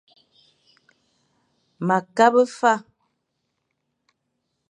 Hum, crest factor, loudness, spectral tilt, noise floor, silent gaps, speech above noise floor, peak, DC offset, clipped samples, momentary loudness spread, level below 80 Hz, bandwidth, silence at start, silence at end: none; 24 dB; -20 LUFS; -5.5 dB/octave; -76 dBFS; none; 58 dB; -2 dBFS; under 0.1%; under 0.1%; 9 LU; -80 dBFS; 10.5 kHz; 1.8 s; 1.9 s